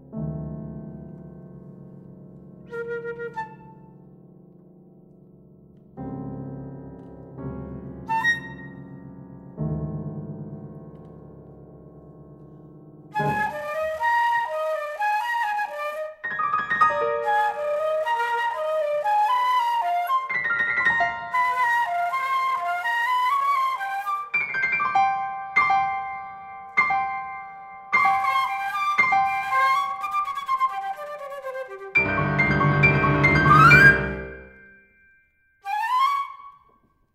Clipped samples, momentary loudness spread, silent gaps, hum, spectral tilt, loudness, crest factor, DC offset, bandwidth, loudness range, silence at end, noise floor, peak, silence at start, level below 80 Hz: under 0.1%; 20 LU; none; none; -6 dB/octave; -22 LUFS; 22 dB; under 0.1%; 16 kHz; 20 LU; 0.65 s; -62 dBFS; -2 dBFS; 0.1 s; -48 dBFS